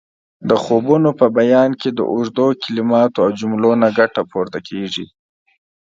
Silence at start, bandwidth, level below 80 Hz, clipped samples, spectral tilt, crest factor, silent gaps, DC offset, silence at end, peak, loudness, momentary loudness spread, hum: 0.4 s; 7.6 kHz; -60 dBFS; under 0.1%; -6.5 dB/octave; 16 dB; none; under 0.1%; 0.8 s; 0 dBFS; -16 LUFS; 11 LU; none